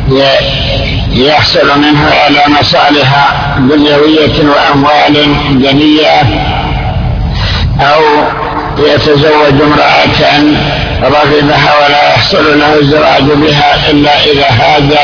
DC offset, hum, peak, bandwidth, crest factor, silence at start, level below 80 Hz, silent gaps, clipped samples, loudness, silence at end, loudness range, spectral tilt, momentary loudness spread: under 0.1%; none; 0 dBFS; 5.4 kHz; 6 dB; 0 s; -22 dBFS; none; 4%; -6 LUFS; 0 s; 2 LU; -6 dB/octave; 6 LU